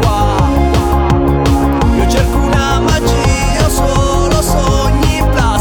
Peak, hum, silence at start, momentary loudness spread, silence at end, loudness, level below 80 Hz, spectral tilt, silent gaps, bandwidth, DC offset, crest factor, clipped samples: 0 dBFS; none; 0 s; 1 LU; 0 s; -12 LUFS; -16 dBFS; -5.5 dB/octave; none; over 20 kHz; under 0.1%; 10 dB; under 0.1%